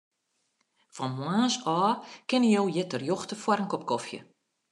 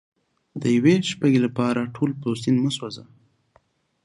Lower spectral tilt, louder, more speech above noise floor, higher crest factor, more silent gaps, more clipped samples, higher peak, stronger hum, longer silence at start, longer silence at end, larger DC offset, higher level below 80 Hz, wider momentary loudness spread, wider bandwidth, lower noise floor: about the same, -5 dB/octave vs -6 dB/octave; second, -28 LUFS vs -22 LUFS; first, 49 dB vs 41 dB; about the same, 18 dB vs 18 dB; neither; neither; second, -10 dBFS vs -4 dBFS; neither; first, 0.95 s vs 0.55 s; second, 0.5 s vs 1 s; neither; second, -80 dBFS vs -64 dBFS; second, 11 LU vs 14 LU; about the same, 11 kHz vs 11.5 kHz; first, -77 dBFS vs -63 dBFS